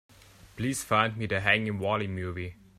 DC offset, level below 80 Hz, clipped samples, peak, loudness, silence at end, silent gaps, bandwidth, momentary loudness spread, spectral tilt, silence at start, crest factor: under 0.1%; -58 dBFS; under 0.1%; -6 dBFS; -28 LUFS; 0.25 s; none; 15 kHz; 10 LU; -4.5 dB/octave; 0.45 s; 24 dB